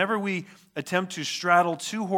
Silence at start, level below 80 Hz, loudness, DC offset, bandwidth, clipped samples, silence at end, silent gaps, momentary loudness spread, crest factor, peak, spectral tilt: 0 s; -80 dBFS; -26 LUFS; under 0.1%; 17 kHz; under 0.1%; 0 s; none; 13 LU; 20 dB; -6 dBFS; -4 dB/octave